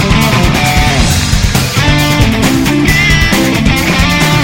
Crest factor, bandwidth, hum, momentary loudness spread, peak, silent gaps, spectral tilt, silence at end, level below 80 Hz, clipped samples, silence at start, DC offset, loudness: 8 dB; 17.5 kHz; none; 2 LU; 0 dBFS; none; -4.5 dB/octave; 0 s; -18 dBFS; 0.8%; 0 s; 0.8%; -9 LUFS